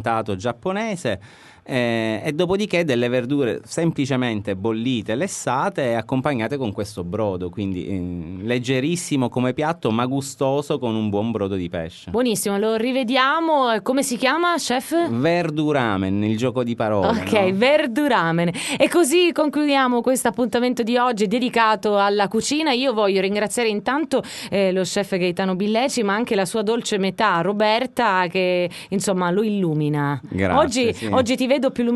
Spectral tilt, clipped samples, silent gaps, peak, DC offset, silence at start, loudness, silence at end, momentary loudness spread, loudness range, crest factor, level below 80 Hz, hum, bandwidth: -5 dB/octave; under 0.1%; none; -2 dBFS; under 0.1%; 0 s; -21 LUFS; 0 s; 7 LU; 5 LU; 18 dB; -56 dBFS; none; 12 kHz